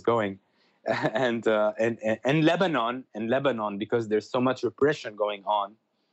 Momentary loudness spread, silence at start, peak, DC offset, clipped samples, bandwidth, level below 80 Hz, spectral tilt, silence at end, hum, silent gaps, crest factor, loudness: 8 LU; 0.05 s; -10 dBFS; under 0.1%; under 0.1%; 8.4 kHz; -74 dBFS; -6.5 dB/octave; 0.45 s; none; none; 16 dB; -27 LUFS